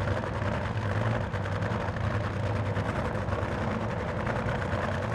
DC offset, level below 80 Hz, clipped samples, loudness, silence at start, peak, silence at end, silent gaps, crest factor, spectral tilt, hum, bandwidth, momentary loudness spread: under 0.1%; -42 dBFS; under 0.1%; -31 LUFS; 0 s; -16 dBFS; 0 s; none; 14 dB; -7 dB/octave; none; 10.5 kHz; 1 LU